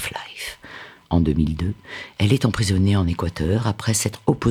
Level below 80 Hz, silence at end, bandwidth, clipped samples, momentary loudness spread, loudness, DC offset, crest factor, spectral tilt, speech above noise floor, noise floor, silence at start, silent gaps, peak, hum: -40 dBFS; 0 s; 16 kHz; under 0.1%; 14 LU; -22 LUFS; under 0.1%; 18 dB; -5.5 dB/octave; 21 dB; -41 dBFS; 0 s; none; -2 dBFS; none